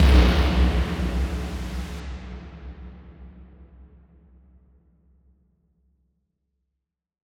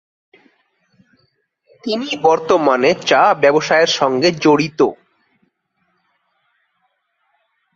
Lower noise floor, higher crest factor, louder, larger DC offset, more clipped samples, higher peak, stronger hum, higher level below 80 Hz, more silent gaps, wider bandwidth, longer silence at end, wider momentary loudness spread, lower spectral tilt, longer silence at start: first, -82 dBFS vs -67 dBFS; about the same, 20 dB vs 18 dB; second, -24 LUFS vs -14 LUFS; neither; neither; second, -4 dBFS vs 0 dBFS; neither; first, -26 dBFS vs -62 dBFS; neither; first, 11 kHz vs 7.8 kHz; first, 3.85 s vs 2.8 s; first, 26 LU vs 8 LU; first, -6.5 dB/octave vs -4 dB/octave; second, 0 s vs 1.85 s